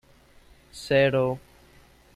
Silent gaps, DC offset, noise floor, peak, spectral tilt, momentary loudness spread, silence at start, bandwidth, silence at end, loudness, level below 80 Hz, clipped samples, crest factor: none; under 0.1%; -55 dBFS; -8 dBFS; -6 dB/octave; 21 LU; 0.75 s; 13.5 kHz; 0.75 s; -23 LUFS; -56 dBFS; under 0.1%; 20 dB